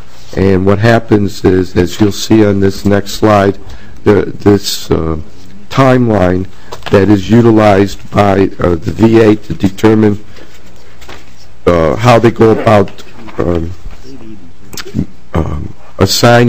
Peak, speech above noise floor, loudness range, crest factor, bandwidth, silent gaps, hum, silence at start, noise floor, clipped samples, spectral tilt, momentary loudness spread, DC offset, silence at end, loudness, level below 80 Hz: 0 dBFS; 29 dB; 3 LU; 10 dB; 16 kHz; none; none; 0.3 s; -37 dBFS; 4%; -6.5 dB/octave; 13 LU; 10%; 0 s; -10 LUFS; -32 dBFS